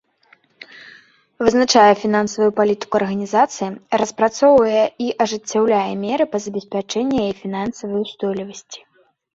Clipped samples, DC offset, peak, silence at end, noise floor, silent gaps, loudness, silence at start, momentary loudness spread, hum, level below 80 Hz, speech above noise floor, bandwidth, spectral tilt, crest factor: under 0.1%; under 0.1%; -2 dBFS; 0.6 s; -56 dBFS; none; -18 LUFS; 0.6 s; 13 LU; none; -56 dBFS; 38 dB; 7.8 kHz; -4.5 dB/octave; 18 dB